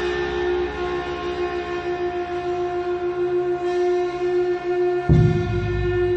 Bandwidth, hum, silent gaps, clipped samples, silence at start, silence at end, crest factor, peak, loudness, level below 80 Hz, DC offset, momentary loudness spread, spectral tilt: 7.6 kHz; none; none; under 0.1%; 0 s; 0 s; 18 dB; -4 dBFS; -23 LUFS; -36 dBFS; under 0.1%; 8 LU; -8 dB/octave